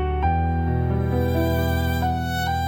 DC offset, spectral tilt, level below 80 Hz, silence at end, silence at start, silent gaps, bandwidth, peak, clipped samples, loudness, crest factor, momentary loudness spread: under 0.1%; -7 dB/octave; -32 dBFS; 0 s; 0 s; none; 17 kHz; -8 dBFS; under 0.1%; -23 LUFS; 12 dB; 2 LU